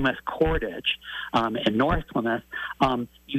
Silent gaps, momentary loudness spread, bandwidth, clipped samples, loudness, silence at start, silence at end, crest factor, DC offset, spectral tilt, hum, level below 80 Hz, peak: none; 6 LU; 15 kHz; under 0.1%; -26 LUFS; 0 s; 0 s; 16 dB; under 0.1%; -6.5 dB/octave; none; -40 dBFS; -10 dBFS